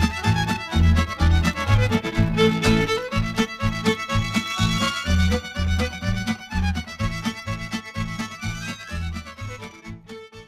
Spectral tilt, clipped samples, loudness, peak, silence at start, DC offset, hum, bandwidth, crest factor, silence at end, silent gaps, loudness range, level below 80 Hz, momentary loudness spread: -5.5 dB/octave; under 0.1%; -23 LUFS; -4 dBFS; 0 s; under 0.1%; none; 14 kHz; 18 dB; 0.05 s; none; 9 LU; -30 dBFS; 13 LU